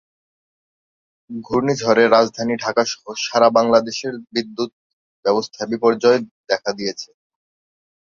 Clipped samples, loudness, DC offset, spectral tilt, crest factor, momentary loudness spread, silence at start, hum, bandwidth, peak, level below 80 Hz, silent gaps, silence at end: under 0.1%; -19 LUFS; under 0.1%; -4 dB/octave; 20 dB; 12 LU; 1.3 s; none; 7.4 kHz; 0 dBFS; -62 dBFS; 4.73-5.23 s, 6.31-6.44 s; 0.95 s